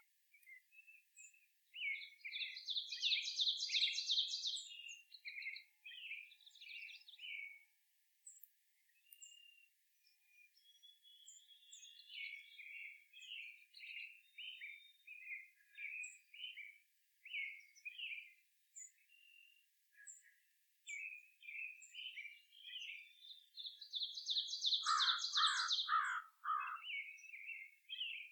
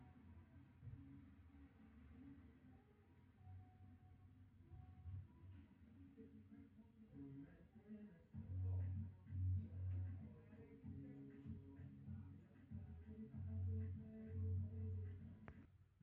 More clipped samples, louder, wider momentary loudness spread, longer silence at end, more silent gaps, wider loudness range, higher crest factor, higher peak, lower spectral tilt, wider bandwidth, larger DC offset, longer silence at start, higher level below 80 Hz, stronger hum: neither; first, -42 LUFS vs -53 LUFS; first, 24 LU vs 19 LU; second, 0 s vs 0.2 s; neither; first, 19 LU vs 14 LU; first, 24 dB vs 16 dB; first, -22 dBFS vs -36 dBFS; second, 9.5 dB/octave vs -11 dB/octave; first, 19 kHz vs 3.2 kHz; neither; first, 0.35 s vs 0 s; second, under -90 dBFS vs -70 dBFS; neither